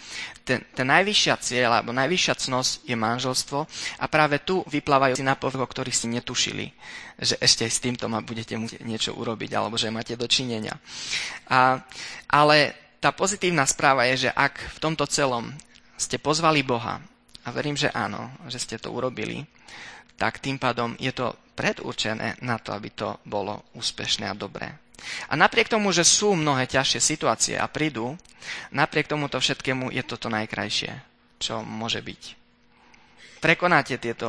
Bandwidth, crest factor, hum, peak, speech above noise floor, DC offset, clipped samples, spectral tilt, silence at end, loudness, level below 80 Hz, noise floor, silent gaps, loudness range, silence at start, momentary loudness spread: 11 kHz; 24 dB; none; 0 dBFS; 33 dB; under 0.1%; under 0.1%; -3 dB/octave; 0 s; -24 LUFS; -56 dBFS; -58 dBFS; none; 8 LU; 0 s; 14 LU